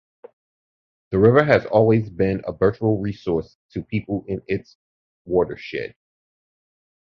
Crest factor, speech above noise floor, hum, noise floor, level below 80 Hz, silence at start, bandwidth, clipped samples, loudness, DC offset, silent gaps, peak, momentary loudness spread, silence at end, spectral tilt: 20 dB; over 70 dB; none; under -90 dBFS; -48 dBFS; 1.1 s; 6.4 kHz; under 0.1%; -21 LUFS; under 0.1%; 3.55-3.69 s, 4.75-5.25 s; -2 dBFS; 14 LU; 1.15 s; -9 dB/octave